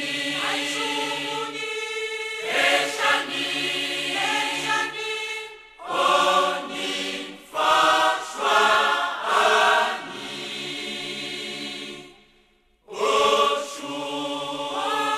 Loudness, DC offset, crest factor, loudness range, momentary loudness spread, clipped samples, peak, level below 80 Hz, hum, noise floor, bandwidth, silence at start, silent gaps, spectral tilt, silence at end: -23 LUFS; under 0.1%; 18 dB; 5 LU; 13 LU; under 0.1%; -6 dBFS; -64 dBFS; none; -61 dBFS; 14 kHz; 0 s; none; -1 dB/octave; 0 s